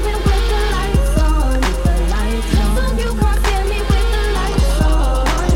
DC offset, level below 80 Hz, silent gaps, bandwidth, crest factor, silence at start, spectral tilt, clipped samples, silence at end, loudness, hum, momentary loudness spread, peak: under 0.1%; -16 dBFS; none; 15.5 kHz; 14 dB; 0 s; -5.5 dB/octave; under 0.1%; 0 s; -17 LUFS; none; 2 LU; -2 dBFS